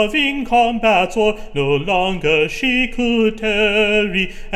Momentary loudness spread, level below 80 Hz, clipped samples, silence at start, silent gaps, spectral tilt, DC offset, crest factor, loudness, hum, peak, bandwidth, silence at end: 4 LU; -34 dBFS; under 0.1%; 0 s; none; -5 dB/octave; under 0.1%; 14 dB; -16 LUFS; none; -2 dBFS; 14.5 kHz; 0 s